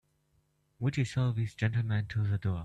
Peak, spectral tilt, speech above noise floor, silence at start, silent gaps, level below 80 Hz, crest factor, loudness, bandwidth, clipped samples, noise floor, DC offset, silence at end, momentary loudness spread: -16 dBFS; -7 dB/octave; 42 dB; 0.8 s; none; -58 dBFS; 16 dB; -32 LUFS; 9.6 kHz; under 0.1%; -73 dBFS; under 0.1%; 0 s; 2 LU